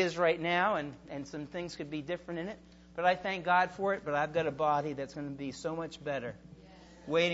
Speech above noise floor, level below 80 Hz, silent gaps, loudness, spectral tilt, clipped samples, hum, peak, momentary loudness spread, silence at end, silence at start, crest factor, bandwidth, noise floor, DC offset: 22 dB; -64 dBFS; none; -33 LUFS; -3 dB/octave; under 0.1%; none; -14 dBFS; 14 LU; 0 s; 0 s; 20 dB; 7.6 kHz; -55 dBFS; under 0.1%